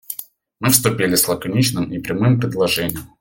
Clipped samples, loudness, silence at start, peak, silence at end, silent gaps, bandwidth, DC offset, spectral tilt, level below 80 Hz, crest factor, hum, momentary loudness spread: under 0.1%; -17 LUFS; 0.1 s; 0 dBFS; 0.15 s; none; 17 kHz; under 0.1%; -4 dB/octave; -50 dBFS; 18 dB; none; 10 LU